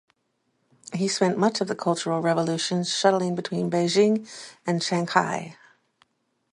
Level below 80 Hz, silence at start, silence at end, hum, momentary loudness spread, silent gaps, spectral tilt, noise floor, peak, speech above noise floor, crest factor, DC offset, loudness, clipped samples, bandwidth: -72 dBFS; 0.9 s; 1 s; none; 9 LU; none; -4.5 dB/octave; -73 dBFS; -2 dBFS; 49 dB; 22 dB; under 0.1%; -24 LUFS; under 0.1%; 11.5 kHz